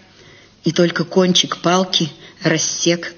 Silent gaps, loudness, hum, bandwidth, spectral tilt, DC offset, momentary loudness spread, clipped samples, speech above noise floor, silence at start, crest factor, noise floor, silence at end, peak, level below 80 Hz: none; -17 LUFS; none; 7 kHz; -3.5 dB/octave; under 0.1%; 8 LU; under 0.1%; 29 dB; 0.65 s; 16 dB; -46 dBFS; 0.05 s; -2 dBFS; -60 dBFS